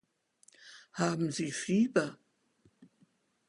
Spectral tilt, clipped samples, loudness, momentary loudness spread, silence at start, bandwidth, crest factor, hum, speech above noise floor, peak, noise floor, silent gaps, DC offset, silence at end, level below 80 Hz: -5 dB/octave; under 0.1%; -32 LUFS; 21 LU; 0.65 s; 11.5 kHz; 22 dB; none; 40 dB; -14 dBFS; -70 dBFS; none; under 0.1%; 0.65 s; -76 dBFS